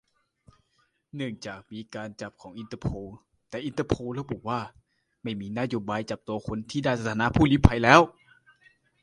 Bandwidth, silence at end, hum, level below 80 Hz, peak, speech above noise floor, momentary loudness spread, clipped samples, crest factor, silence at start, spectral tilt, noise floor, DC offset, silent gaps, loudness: 11.5 kHz; 0.95 s; none; -40 dBFS; 0 dBFS; 45 dB; 21 LU; under 0.1%; 28 dB; 1.15 s; -6 dB/octave; -71 dBFS; under 0.1%; none; -26 LUFS